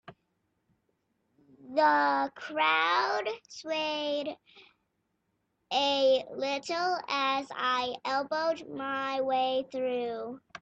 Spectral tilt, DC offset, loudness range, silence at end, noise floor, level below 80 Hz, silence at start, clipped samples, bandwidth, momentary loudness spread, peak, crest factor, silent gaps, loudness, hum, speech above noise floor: -2.5 dB/octave; under 0.1%; 3 LU; 0.05 s; -79 dBFS; -78 dBFS; 0.1 s; under 0.1%; 8.4 kHz; 10 LU; -12 dBFS; 18 dB; none; -29 LUFS; none; 49 dB